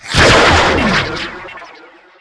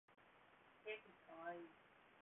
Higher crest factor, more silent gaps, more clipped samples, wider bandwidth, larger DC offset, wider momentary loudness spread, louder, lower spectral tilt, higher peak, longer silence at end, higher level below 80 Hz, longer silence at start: second, 12 dB vs 20 dB; neither; neither; first, 11 kHz vs 3.8 kHz; neither; first, 20 LU vs 16 LU; first, -10 LUFS vs -56 LUFS; first, -4 dB/octave vs 0.5 dB/octave; first, 0 dBFS vs -38 dBFS; first, 0.55 s vs 0 s; first, -26 dBFS vs under -90 dBFS; about the same, 0.05 s vs 0.1 s